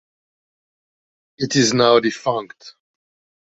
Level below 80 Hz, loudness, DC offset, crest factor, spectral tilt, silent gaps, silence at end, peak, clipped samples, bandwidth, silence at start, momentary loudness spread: -62 dBFS; -17 LUFS; under 0.1%; 20 dB; -4 dB/octave; none; 0.75 s; -2 dBFS; under 0.1%; 8.2 kHz; 1.4 s; 13 LU